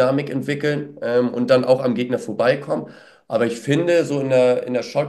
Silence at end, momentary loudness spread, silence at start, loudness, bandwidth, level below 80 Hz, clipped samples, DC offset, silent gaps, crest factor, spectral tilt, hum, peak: 0 s; 8 LU; 0 s; -20 LUFS; 12.5 kHz; -68 dBFS; under 0.1%; under 0.1%; none; 16 dB; -6.5 dB/octave; none; -2 dBFS